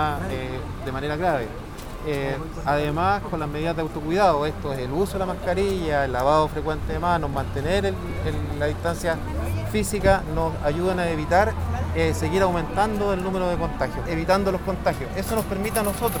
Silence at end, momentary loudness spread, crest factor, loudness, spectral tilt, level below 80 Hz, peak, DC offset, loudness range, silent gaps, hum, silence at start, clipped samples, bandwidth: 0 s; 8 LU; 20 dB; -24 LUFS; -6 dB/octave; -34 dBFS; -4 dBFS; under 0.1%; 3 LU; none; none; 0 s; under 0.1%; over 20 kHz